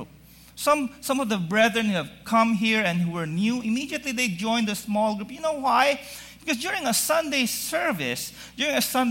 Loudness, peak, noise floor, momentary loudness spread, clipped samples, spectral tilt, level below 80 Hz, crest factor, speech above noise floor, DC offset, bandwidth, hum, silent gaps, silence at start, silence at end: -24 LUFS; -6 dBFS; -50 dBFS; 8 LU; under 0.1%; -3.5 dB/octave; -58 dBFS; 18 dB; 26 dB; under 0.1%; 16.5 kHz; none; none; 0 s; 0 s